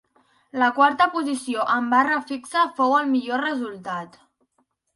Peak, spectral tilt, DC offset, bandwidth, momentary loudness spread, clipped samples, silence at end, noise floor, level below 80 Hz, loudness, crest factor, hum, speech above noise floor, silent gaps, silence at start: -4 dBFS; -3.5 dB/octave; under 0.1%; 11.5 kHz; 13 LU; under 0.1%; 0.9 s; -70 dBFS; -72 dBFS; -22 LUFS; 18 dB; none; 48 dB; none; 0.55 s